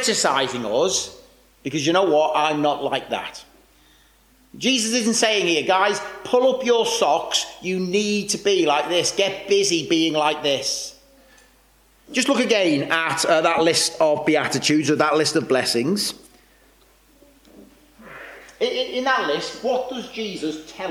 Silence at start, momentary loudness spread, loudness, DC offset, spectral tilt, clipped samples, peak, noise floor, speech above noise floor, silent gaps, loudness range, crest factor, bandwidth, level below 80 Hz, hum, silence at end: 0 s; 11 LU; -20 LUFS; under 0.1%; -3 dB/octave; under 0.1%; -4 dBFS; -56 dBFS; 36 dB; none; 7 LU; 16 dB; 17 kHz; -60 dBFS; none; 0 s